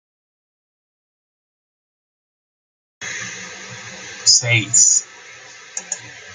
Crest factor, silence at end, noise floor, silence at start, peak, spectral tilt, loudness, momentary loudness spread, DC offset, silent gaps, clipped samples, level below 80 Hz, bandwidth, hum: 22 dB; 0 s; -40 dBFS; 3 s; 0 dBFS; -0.5 dB/octave; -14 LUFS; 21 LU; under 0.1%; none; under 0.1%; -68 dBFS; 11 kHz; none